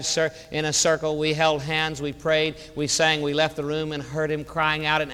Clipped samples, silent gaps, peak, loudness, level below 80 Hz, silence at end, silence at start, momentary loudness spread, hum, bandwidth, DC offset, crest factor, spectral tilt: under 0.1%; none; -6 dBFS; -23 LUFS; -50 dBFS; 0 s; 0 s; 7 LU; none; 16 kHz; under 0.1%; 18 dB; -3 dB/octave